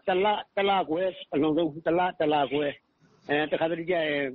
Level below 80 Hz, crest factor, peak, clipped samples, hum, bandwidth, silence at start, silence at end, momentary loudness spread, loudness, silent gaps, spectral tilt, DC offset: -62 dBFS; 14 dB; -12 dBFS; under 0.1%; none; 4.8 kHz; 0.05 s; 0 s; 5 LU; -27 LUFS; none; -3 dB/octave; under 0.1%